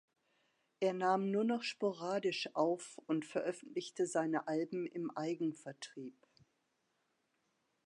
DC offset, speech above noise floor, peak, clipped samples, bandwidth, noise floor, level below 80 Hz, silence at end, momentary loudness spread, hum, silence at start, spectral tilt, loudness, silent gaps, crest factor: under 0.1%; 44 dB; -20 dBFS; under 0.1%; 11 kHz; -82 dBFS; under -90 dBFS; 1.75 s; 12 LU; none; 0.8 s; -5 dB/octave; -38 LUFS; none; 20 dB